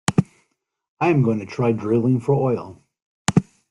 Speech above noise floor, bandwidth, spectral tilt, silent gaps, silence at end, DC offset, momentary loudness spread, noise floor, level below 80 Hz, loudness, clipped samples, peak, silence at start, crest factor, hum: 52 dB; 12 kHz; -6.5 dB/octave; 0.88-0.97 s, 3.02-3.25 s; 0.3 s; under 0.1%; 8 LU; -71 dBFS; -54 dBFS; -21 LUFS; under 0.1%; 0 dBFS; 0.1 s; 20 dB; none